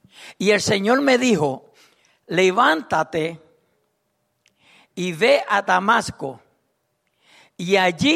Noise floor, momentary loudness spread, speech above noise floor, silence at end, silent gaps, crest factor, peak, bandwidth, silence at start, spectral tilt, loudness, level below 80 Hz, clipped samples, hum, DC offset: -71 dBFS; 13 LU; 52 dB; 0 s; none; 18 dB; -4 dBFS; 15 kHz; 0.2 s; -4 dB/octave; -19 LUFS; -60 dBFS; under 0.1%; none; under 0.1%